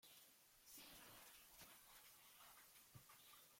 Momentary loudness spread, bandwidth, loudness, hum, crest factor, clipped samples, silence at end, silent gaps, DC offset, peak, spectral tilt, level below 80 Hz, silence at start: 5 LU; 16.5 kHz; -64 LUFS; none; 18 dB; under 0.1%; 0 s; none; under 0.1%; -50 dBFS; -1.5 dB/octave; -86 dBFS; 0 s